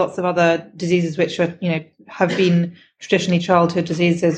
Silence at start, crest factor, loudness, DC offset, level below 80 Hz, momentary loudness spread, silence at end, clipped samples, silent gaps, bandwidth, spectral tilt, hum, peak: 0 s; 16 dB; -19 LUFS; under 0.1%; -62 dBFS; 7 LU; 0 s; under 0.1%; none; 8.6 kHz; -6.5 dB/octave; none; -2 dBFS